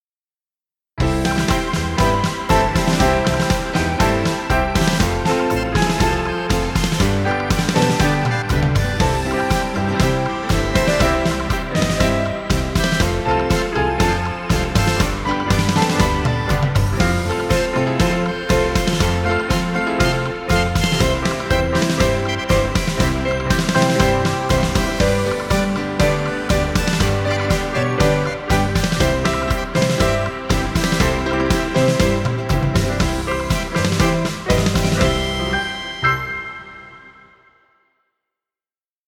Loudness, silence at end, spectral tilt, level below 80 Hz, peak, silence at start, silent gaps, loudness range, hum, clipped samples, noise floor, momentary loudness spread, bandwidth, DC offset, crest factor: -18 LUFS; 1.95 s; -5 dB/octave; -26 dBFS; -2 dBFS; 0.95 s; none; 1 LU; none; under 0.1%; under -90 dBFS; 4 LU; 19 kHz; under 0.1%; 16 dB